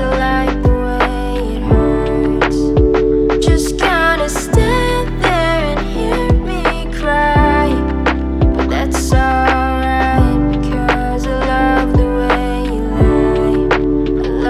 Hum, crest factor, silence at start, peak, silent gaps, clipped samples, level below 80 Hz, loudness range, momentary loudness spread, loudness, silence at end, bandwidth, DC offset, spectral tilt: none; 12 dB; 0 s; 0 dBFS; none; under 0.1%; -18 dBFS; 1 LU; 5 LU; -14 LUFS; 0 s; 13.5 kHz; under 0.1%; -6 dB/octave